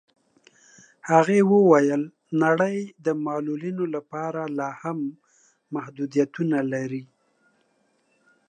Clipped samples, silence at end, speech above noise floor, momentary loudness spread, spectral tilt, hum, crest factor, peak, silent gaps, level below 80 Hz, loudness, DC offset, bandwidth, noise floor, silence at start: under 0.1%; 1.45 s; 45 dB; 15 LU; -7 dB/octave; none; 20 dB; -4 dBFS; none; -78 dBFS; -24 LUFS; under 0.1%; 9.6 kHz; -68 dBFS; 1.05 s